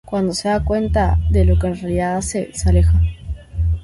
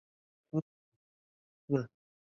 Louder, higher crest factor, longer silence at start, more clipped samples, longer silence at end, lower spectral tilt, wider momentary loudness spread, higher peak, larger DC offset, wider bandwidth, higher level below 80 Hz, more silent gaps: first, -18 LUFS vs -37 LUFS; second, 12 dB vs 24 dB; second, 0.1 s vs 0.55 s; neither; second, 0 s vs 0.4 s; second, -6.5 dB/octave vs -10 dB/octave; second, 8 LU vs 13 LU; first, -4 dBFS vs -16 dBFS; neither; first, 11.5 kHz vs 6.8 kHz; first, -20 dBFS vs -78 dBFS; second, none vs 0.62-1.68 s